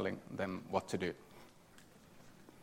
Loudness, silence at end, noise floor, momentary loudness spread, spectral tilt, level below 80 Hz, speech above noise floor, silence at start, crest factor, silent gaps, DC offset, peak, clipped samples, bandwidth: -41 LUFS; 0 s; -61 dBFS; 23 LU; -5.5 dB/octave; -72 dBFS; 21 dB; 0 s; 24 dB; none; under 0.1%; -20 dBFS; under 0.1%; 16 kHz